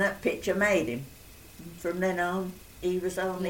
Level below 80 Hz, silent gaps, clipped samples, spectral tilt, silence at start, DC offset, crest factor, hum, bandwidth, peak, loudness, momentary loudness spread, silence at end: -56 dBFS; none; under 0.1%; -5 dB/octave; 0 s; under 0.1%; 18 dB; none; 17 kHz; -12 dBFS; -29 LUFS; 21 LU; 0 s